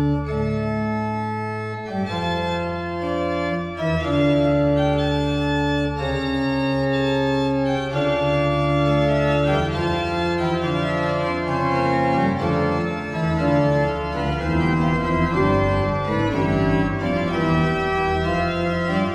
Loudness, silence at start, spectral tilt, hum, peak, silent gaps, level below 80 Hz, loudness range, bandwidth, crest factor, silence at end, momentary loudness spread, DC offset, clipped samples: -21 LUFS; 0 s; -7.5 dB/octave; none; -6 dBFS; none; -36 dBFS; 2 LU; 11 kHz; 14 dB; 0 s; 6 LU; under 0.1%; under 0.1%